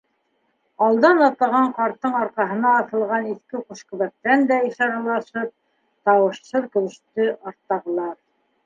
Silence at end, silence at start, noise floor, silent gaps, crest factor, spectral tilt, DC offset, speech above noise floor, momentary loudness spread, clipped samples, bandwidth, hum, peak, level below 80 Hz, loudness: 0.5 s; 0.8 s; -69 dBFS; none; 20 dB; -6 dB/octave; under 0.1%; 48 dB; 13 LU; under 0.1%; 7.6 kHz; none; -2 dBFS; -74 dBFS; -21 LUFS